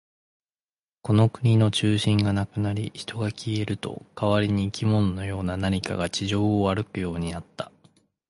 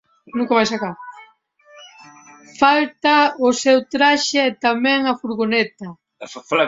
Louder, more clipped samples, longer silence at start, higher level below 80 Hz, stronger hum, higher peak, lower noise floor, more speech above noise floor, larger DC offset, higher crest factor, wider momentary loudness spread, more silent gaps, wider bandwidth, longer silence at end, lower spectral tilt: second, -25 LUFS vs -17 LUFS; neither; first, 1.05 s vs 0.35 s; first, -46 dBFS vs -62 dBFS; neither; second, -8 dBFS vs -2 dBFS; first, under -90 dBFS vs -52 dBFS; first, over 66 dB vs 35 dB; neither; about the same, 16 dB vs 18 dB; second, 12 LU vs 21 LU; neither; first, 11.5 kHz vs 7.8 kHz; first, 0.65 s vs 0 s; first, -6.5 dB/octave vs -3 dB/octave